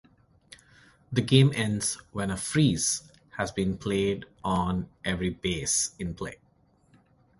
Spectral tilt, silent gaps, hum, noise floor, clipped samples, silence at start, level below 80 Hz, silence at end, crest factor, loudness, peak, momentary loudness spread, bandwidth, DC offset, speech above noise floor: -4.5 dB/octave; none; none; -64 dBFS; under 0.1%; 1.1 s; -50 dBFS; 1.05 s; 22 dB; -27 LUFS; -6 dBFS; 11 LU; 11.5 kHz; under 0.1%; 37 dB